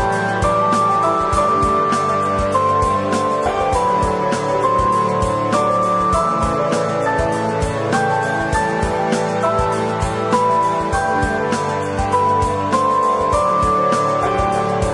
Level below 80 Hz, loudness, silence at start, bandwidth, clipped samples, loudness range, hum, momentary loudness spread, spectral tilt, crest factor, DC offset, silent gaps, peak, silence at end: -34 dBFS; -17 LUFS; 0 s; 11.5 kHz; under 0.1%; 2 LU; none; 3 LU; -5.5 dB/octave; 16 dB; under 0.1%; none; -2 dBFS; 0 s